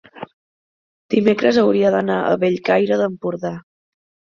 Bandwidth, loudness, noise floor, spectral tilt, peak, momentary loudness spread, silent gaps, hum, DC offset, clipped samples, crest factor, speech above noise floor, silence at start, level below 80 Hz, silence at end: 7.2 kHz; -18 LUFS; under -90 dBFS; -7 dB/octave; -2 dBFS; 20 LU; 0.33-1.09 s; none; under 0.1%; under 0.1%; 16 dB; over 73 dB; 0.15 s; -60 dBFS; 0.75 s